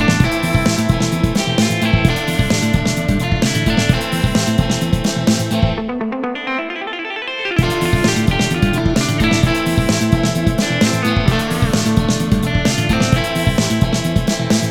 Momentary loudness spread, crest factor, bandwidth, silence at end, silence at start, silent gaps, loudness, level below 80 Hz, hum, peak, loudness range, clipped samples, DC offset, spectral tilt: 5 LU; 16 dB; 19 kHz; 0 s; 0 s; none; -16 LUFS; -28 dBFS; none; 0 dBFS; 3 LU; under 0.1%; 0.4%; -5 dB/octave